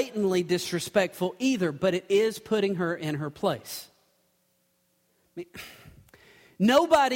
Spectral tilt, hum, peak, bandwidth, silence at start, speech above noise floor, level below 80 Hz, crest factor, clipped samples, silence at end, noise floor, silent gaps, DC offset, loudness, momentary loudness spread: -5 dB/octave; none; -6 dBFS; 16.5 kHz; 0 s; 45 dB; -64 dBFS; 20 dB; under 0.1%; 0 s; -71 dBFS; none; under 0.1%; -26 LUFS; 20 LU